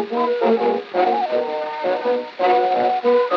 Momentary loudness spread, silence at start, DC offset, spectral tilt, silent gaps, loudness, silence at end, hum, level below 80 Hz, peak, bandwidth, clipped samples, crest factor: 6 LU; 0 s; under 0.1%; -6 dB/octave; none; -19 LUFS; 0 s; none; -84 dBFS; -6 dBFS; 6.2 kHz; under 0.1%; 14 dB